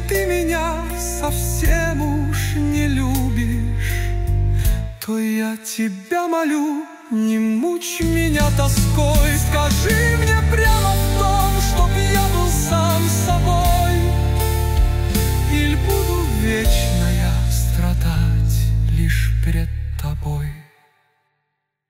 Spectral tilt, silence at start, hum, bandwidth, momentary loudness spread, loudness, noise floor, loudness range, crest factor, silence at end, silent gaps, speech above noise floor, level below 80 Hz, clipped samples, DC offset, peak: -5 dB/octave; 0 s; none; 16.5 kHz; 7 LU; -19 LUFS; -75 dBFS; 4 LU; 12 dB; 1.25 s; none; 57 dB; -22 dBFS; under 0.1%; under 0.1%; -4 dBFS